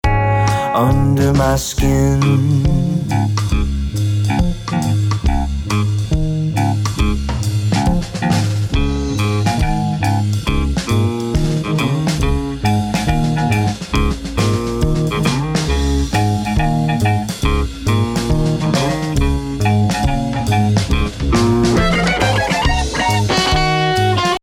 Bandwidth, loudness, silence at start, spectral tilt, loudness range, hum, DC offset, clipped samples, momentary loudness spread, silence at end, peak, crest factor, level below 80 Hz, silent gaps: 16.5 kHz; -16 LUFS; 0.05 s; -6 dB/octave; 3 LU; none; under 0.1%; under 0.1%; 5 LU; 0.05 s; -4 dBFS; 12 dB; -22 dBFS; none